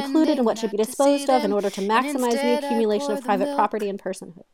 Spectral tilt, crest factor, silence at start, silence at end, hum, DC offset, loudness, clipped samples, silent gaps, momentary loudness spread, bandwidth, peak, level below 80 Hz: -4.5 dB/octave; 16 dB; 0 s; 0.2 s; none; 0.2%; -22 LUFS; under 0.1%; none; 7 LU; 17 kHz; -6 dBFS; -70 dBFS